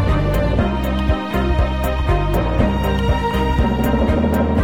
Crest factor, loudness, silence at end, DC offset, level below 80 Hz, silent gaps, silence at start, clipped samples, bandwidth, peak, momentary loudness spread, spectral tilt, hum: 12 dB; -18 LUFS; 0 s; 0.9%; -20 dBFS; none; 0 s; under 0.1%; 17 kHz; -4 dBFS; 3 LU; -7.5 dB/octave; none